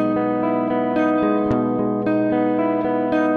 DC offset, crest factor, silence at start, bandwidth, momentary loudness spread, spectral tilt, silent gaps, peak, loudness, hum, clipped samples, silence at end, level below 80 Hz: under 0.1%; 14 dB; 0 s; 4.7 kHz; 2 LU; -9 dB/octave; none; -6 dBFS; -20 LUFS; none; under 0.1%; 0 s; -52 dBFS